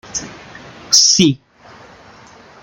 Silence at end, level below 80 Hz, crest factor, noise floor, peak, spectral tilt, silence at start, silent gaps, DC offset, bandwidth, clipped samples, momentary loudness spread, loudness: 1.25 s; -54 dBFS; 18 dB; -42 dBFS; 0 dBFS; -2 dB/octave; 0.15 s; none; under 0.1%; 16 kHz; under 0.1%; 20 LU; -10 LUFS